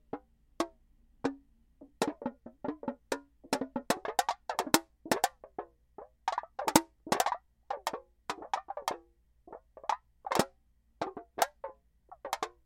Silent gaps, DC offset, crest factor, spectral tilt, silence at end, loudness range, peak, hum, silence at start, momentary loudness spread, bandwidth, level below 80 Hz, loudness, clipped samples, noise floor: none; under 0.1%; 32 dB; -3 dB/octave; 0.15 s; 6 LU; -4 dBFS; none; 0.15 s; 17 LU; 16 kHz; -66 dBFS; -35 LUFS; under 0.1%; -68 dBFS